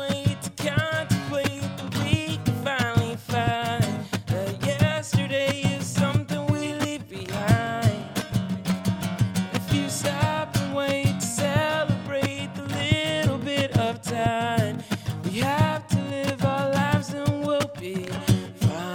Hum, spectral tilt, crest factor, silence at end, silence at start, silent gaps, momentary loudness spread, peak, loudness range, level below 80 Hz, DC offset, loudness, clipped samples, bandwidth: none; -5.5 dB/octave; 18 dB; 0 s; 0 s; none; 5 LU; -6 dBFS; 1 LU; -48 dBFS; under 0.1%; -25 LUFS; under 0.1%; 19 kHz